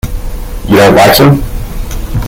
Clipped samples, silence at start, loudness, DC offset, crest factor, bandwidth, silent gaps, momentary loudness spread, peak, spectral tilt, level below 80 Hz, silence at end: 2%; 0.05 s; -6 LUFS; under 0.1%; 8 dB; over 20 kHz; none; 19 LU; 0 dBFS; -5.5 dB/octave; -18 dBFS; 0 s